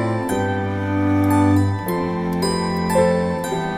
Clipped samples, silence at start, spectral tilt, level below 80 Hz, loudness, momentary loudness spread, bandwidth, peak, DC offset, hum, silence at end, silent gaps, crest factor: under 0.1%; 0 s; -6.5 dB/octave; -44 dBFS; -20 LUFS; 6 LU; 16 kHz; -6 dBFS; under 0.1%; none; 0 s; none; 14 dB